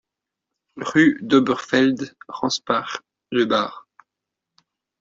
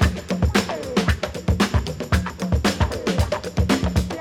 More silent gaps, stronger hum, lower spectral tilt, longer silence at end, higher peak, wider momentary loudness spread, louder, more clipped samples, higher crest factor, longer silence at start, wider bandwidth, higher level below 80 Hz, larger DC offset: neither; neither; about the same, -4.5 dB/octave vs -5.5 dB/octave; first, 1.2 s vs 0 s; about the same, -4 dBFS vs -4 dBFS; first, 15 LU vs 4 LU; about the same, -20 LUFS vs -22 LUFS; neither; about the same, 20 dB vs 18 dB; first, 0.75 s vs 0 s; second, 7.6 kHz vs 16 kHz; second, -64 dBFS vs -28 dBFS; neither